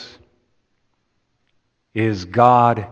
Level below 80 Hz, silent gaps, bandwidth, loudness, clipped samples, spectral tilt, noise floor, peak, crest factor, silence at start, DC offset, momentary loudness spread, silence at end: -60 dBFS; none; 7.8 kHz; -16 LUFS; under 0.1%; -7.5 dB/octave; -68 dBFS; 0 dBFS; 20 dB; 0 s; under 0.1%; 11 LU; 0 s